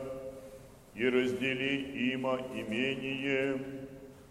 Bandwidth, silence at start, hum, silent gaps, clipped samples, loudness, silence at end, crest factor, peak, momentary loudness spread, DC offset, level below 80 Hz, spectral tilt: 15 kHz; 0 s; none; none; under 0.1%; -33 LUFS; 0 s; 18 dB; -16 dBFS; 19 LU; under 0.1%; -62 dBFS; -5.5 dB/octave